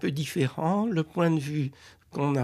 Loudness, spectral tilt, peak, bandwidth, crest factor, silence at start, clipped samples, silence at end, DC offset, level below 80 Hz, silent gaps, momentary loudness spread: -28 LUFS; -7 dB/octave; -10 dBFS; 14.5 kHz; 16 dB; 0 s; under 0.1%; 0 s; under 0.1%; -64 dBFS; none; 7 LU